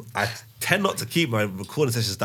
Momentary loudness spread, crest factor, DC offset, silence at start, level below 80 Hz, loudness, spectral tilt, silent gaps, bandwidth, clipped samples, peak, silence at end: 6 LU; 22 dB; under 0.1%; 0 s; -64 dBFS; -24 LUFS; -4.5 dB/octave; none; 18.5 kHz; under 0.1%; -2 dBFS; 0 s